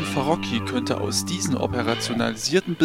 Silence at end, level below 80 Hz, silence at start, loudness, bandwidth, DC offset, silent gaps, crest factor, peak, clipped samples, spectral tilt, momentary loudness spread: 0 s; -50 dBFS; 0 s; -24 LUFS; 16.5 kHz; under 0.1%; none; 18 dB; -6 dBFS; under 0.1%; -4 dB/octave; 2 LU